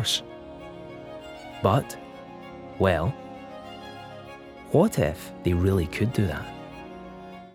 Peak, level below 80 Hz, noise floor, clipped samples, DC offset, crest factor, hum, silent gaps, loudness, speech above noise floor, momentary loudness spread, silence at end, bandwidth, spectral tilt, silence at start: -8 dBFS; -50 dBFS; -43 dBFS; under 0.1%; under 0.1%; 20 dB; none; none; -25 LUFS; 19 dB; 19 LU; 0.1 s; 16.5 kHz; -5.5 dB/octave; 0 s